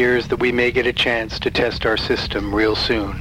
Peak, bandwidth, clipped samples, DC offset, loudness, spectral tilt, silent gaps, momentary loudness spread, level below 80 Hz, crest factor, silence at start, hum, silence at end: -4 dBFS; 15.5 kHz; under 0.1%; under 0.1%; -19 LUFS; -5.5 dB/octave; none; 4 LU; -34 dBFS; 14 dB; 0 s; none; 0 s